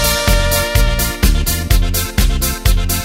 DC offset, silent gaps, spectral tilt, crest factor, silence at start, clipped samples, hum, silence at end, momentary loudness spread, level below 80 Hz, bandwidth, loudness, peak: under 0.1%; none; -3.5 dB/octave; 14 dB; 0 s; under 0.1%; none; 0 s; 3 LU; -16 dBFS; 16.5 kHz; -15 LUFS; 0 dBFS